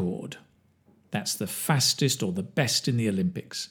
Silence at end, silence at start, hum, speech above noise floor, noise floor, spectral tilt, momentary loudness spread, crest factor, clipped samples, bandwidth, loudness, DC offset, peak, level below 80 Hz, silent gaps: 0.05 s; 0 s; none; 36 dB; -62 dBFS; -4 dB/octave; 12 LU; 22 dB; under 0.1%; over 20 kHz; -26 LUFS; under 0.1%; -6 dBFS; -68 dBFS; none